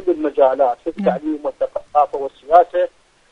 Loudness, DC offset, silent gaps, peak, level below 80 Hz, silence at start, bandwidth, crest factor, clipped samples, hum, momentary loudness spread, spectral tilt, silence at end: -18 LUFS; under 0.1%; none; 0 dBFS; -54 dBFS; 0 s; 6.8 kHz; 18 dB; under 0.1%; none; 10 LU; -8 dB/octave; 0.45 s